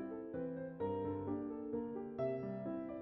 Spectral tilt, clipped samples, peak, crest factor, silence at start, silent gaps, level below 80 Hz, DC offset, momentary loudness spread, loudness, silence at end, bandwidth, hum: -9 dB/octave; under 0.1%; -28 dBFS; 14 dB; 0 s; none; -72 dBFS; under 0.1%; 4 LU; -43 LUFS; 0 s; 5.8 kHz; none